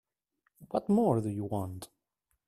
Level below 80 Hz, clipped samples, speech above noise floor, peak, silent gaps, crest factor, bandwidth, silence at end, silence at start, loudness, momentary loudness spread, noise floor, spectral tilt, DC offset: -66 dBFS; under 0.1%; 51 dB; -14 dBFS; none; 20 dB; 14 kHz; 0.65 s; 0.6 s; -31 LUFS; 18 LU; -81 dBFS; -8.5 dB/octave; under 0.1%